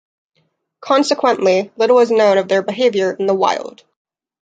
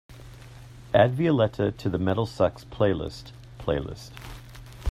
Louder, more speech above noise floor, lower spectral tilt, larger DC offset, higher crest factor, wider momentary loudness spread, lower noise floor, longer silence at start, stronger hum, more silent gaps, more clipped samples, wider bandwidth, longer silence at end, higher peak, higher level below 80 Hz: first, -15 LUFS vs -25 LUFS; first, 50 dB vs 20 dB; second, -4.5 dB/octave vs -7.5 dB/octave; neither; second, 14 dB vs 22 dB; second, 6 LU vs 24 LU; first, -65 dBFS vs -45 dBFS; first, 0.8 s vs 0.1 s; neither; neither; neither; second, 9.2 kHz vs 14.5 kHz; first, 0.7 s vs 0 s; about the same, -2 dBFS vs -4 dBFS; second, -70 dBFS vs -48 dBFS